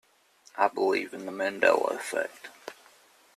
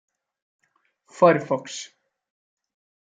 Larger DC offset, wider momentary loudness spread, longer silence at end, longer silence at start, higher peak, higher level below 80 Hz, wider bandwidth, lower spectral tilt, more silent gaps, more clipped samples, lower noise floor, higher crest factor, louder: neither; about the same, 20 LU vs 18 LU; second, 0.65 s vs 1.15 s; second, 0.55 s vs 1.2 s; second, -8 dBFS vs -4 dBFS; about the same, -76 dBFS vs -76 dBFS; first, 14 kHz vs 9.2 kHz; second, -3 dB/octave vs -5.5 dB/octave; neither; neither; second, -61 dBFS vs -67 dBFS; about the same, 22 dB vs 24 dB; second, -28 LUFS vs -21 LUFS